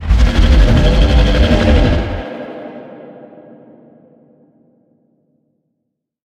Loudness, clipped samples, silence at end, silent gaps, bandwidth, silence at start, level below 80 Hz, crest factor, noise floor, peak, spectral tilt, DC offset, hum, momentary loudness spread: -13 LUFS; under 0.1%; 3.15 s; none; 8.6 kHz; 0 s; -16 dBFS; 14 dB; -73 dBFS; 0 dBFS; -7 dB/octave; under 0.1%; none; 22 LU